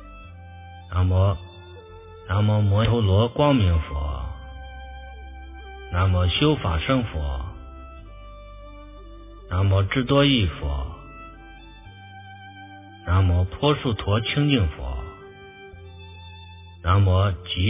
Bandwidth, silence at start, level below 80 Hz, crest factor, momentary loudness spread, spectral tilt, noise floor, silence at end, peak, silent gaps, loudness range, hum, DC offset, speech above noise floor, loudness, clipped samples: 3.8 kHz; 0 s; -32 dBFS; 18 dB; 24 LU; -11 dB/octave; -43 dBFS; 0 s; -4 dBFS; none; 4 LU; none; under 0.1%; 23 dB; -22 LUFS; under 0.1%